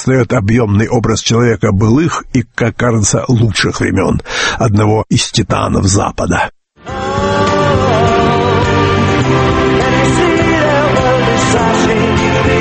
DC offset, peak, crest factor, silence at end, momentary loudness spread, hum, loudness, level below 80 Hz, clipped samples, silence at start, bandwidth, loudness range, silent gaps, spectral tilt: under 0.1%; 0 dBFS; 12 dB; 0 s; 4 LU; none; -12 LUFS; -30 dBFS; under 0.1%; 0 s; 8.8 kHz; 2 LU; none; -5 dB/octave